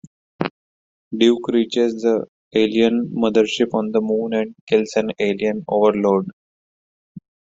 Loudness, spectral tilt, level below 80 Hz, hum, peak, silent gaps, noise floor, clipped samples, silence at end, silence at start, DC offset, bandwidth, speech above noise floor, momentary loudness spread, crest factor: -19 LUFS; -5.5 dB/octave; -60 dBFS; none; -2 dBFS; 0.51-1.11 s, 2.29-2.51 s, 4.61-4.67 s, 6.33-7.15 s; under -90 dBFS; under 0.1%; 0.4 s; 0.4 s; under 0.1%; 7.8 kHz; over 72 dB; 8 LU; 16 dB